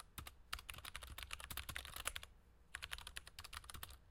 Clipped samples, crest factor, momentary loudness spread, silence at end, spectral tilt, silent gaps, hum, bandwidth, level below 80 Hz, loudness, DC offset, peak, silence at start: under 0.1%; 32 dB; 8 LU; 0 s; -1 dB/octave; none; none; 17 kHz; -60 dBFS; -50 LUFS; under 0.1%; -20 dBFS; 0 s